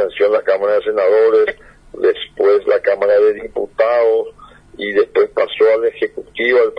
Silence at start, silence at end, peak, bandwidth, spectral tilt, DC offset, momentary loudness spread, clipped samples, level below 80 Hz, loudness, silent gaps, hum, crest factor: 0 s; 0 s; -2 dBFS; 5.4 kHz; -5.5 dB/octave; under 0.1%; 8 LU; under 0.1%; -52 dBFS; -15 LUFS; none; none; 14 dB